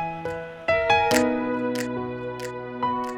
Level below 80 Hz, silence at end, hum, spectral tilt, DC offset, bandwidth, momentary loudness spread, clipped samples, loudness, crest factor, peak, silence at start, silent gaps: -52 dBFS; 0 s; none; -4 dB/octave; under 0.1%; 18 kHz; 13 LU; under 0.1%; -25 LUFS; 20 dB; -4 dBFS; 0 s; none